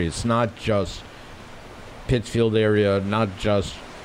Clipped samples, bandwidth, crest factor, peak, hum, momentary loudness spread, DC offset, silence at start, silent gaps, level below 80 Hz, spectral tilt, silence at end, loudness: under 0.1%; 13.5 kHz; 16 dB; -8 dBFS; none; 22 LU; under 0.1%; 0 s; none; -42 dBFS; -6 dB/octave; 0 s; -22 LUFS